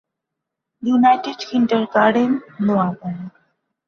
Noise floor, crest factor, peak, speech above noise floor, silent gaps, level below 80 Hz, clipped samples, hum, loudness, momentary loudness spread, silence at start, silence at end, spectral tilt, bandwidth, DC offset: -81 dBFS; 16 dB; -2 dBFS; 64 dB; none; -64 dBFS; under 0.1%; none; -18 LUFS; 14 LU; 0.8 s; 0.6 s; -7 dB/octave; 6.8 kHz; under 0.1%